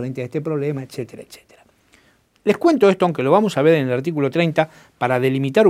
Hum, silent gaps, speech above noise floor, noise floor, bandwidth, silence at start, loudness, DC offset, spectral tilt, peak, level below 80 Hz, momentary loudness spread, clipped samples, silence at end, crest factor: none; none; 39 dB; -57 dBFS; 15 kHz; 0 s; -19 LUFS; under 0.1%; -7 dB/octave; 0 dBFS; -64 dBFS; 12 LU; under 0.1%; 0 s; 18 dB